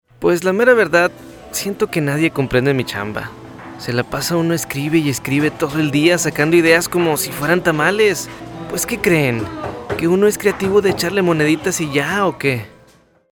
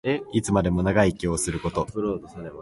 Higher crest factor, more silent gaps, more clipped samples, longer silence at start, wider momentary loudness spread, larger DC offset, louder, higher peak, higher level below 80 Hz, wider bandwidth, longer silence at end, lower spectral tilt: about the same, 16 dB vs 18 dB; neither; neither; first, 0.2 s vs 0.05 s; first, 12 LU vs 8 LU; neither; first, -16 LUFS vs -24 LUFS; first, 0 dBFS vs -6 dBFS; second, -46 dBFS vs -40 dBFS; first, over 20 kHz vs 11.5 kHz; first, 0.65 s vs 0 s; about the same, -4.5 dB/octave vs -5.5 dB/octave